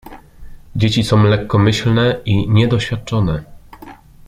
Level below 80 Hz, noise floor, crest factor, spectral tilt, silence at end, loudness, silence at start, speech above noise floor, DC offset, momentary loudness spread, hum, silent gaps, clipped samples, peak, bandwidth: -36 dBFS; -38 dBFS; 14 dB; -6.5 dB/octave; 0.35 s; -15 LUFS; 0.05 s; 24 dB; under 0.1%; 7 LU; none; none; under 0.1%; -2 dBFS; 11 kHz